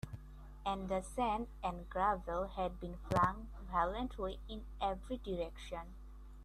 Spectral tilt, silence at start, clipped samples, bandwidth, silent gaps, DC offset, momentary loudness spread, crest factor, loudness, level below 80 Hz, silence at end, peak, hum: -6 dB/octave; 0.05 s; under 0.1%; 13.5 kHz; none; under 0.1%; 14 LU; 22 dB; -39 LUFS; -50 dBFS; 0 s; -18 dBFS; none